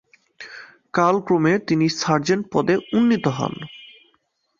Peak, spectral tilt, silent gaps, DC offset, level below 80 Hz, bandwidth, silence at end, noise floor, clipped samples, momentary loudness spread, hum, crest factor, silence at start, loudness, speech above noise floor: -2 dBFS; -6 dB/octave; none; under 0.1%; -60 dBFS; 7.4 kHz; 0.75 s; -67 dBFS; under 0.1%; 20 LU; none; 18 dB; 0.4 s; -20 LUFS; 48 dB